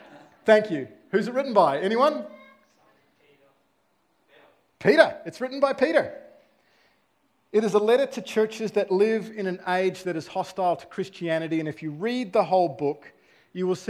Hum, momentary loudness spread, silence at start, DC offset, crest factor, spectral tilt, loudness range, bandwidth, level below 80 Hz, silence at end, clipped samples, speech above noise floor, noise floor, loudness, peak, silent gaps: none; 12 LU; 0.1 s; under 0.1%; 24 dB; -5.5 dB/octave; 3 LU; 13.5 kHz; -74 dBFS; 0.05 s; under 0.1%; 45 dB; -69 dBFS; -24 LUFS; -2 dBFS; none